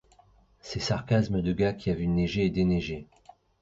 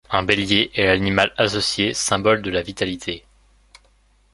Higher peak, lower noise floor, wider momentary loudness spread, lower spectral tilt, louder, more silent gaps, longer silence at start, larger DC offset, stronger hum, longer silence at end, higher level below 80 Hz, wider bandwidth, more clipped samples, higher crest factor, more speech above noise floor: second, -12 dBFS vs 0 dBFS; about the same, -60 dBFS vs -58 dBFS; first, 12 LU vs 8 LU; first, -7 dB/octave vs -3.5 dB/octave; second, -28 LUFS vs -19 LUFS; neither; first, 0.65 s vs 0.1 s; neither; second, none vs 50 Hz at -45 dBFS; second, 0.6 s vs 1.15 s; about the same, -46 dBFS vs -44 dBFS; second, 7.8 kHz vs 11.5 kHz; neither; second, 16 dB vs 22 dB; second, 34 dB vs 38 dB